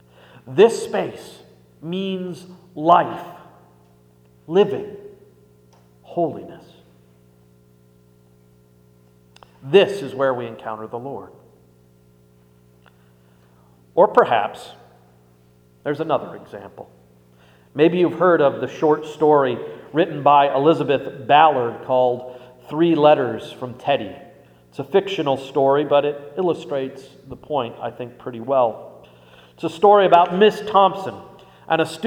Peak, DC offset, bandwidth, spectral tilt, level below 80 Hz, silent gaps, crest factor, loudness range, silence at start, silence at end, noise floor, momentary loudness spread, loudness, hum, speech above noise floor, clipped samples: 0 dBFS; under 0.1%; 14.5 kHz; -6 dB/octave; -64 dBFS; none; 20 dB; 12 LU; 0.45 s; 0 s; -54 dBFS; 21 LU; -19 LUFS; 60 Hz at -55 dBFS; 35 dB; under 0.1%